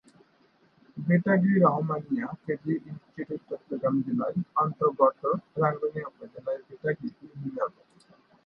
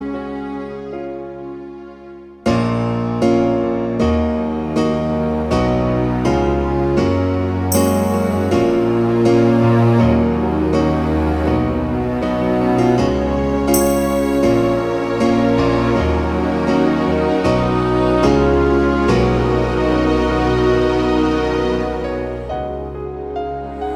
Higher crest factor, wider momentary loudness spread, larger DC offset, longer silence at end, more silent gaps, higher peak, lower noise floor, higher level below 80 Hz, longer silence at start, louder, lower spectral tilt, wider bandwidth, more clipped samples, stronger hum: first, 20 dB vs 14 dB; first, 15 LU vs 12 LU; neither; first, 0.75 s vs 0 s; neither; second, -8 dBFS vs -2 dBFS; first, -64 dBFS vs -37 dBFS; second, -70 dBFS vs -28 dBFS; first, 0.95 s vs 0 s; second, -28 LUFS vs -17 LUFS; first, -11 dB/octave vs -7 dB/octave; second, 5.2 kHz vs 19 kHz; neither; neither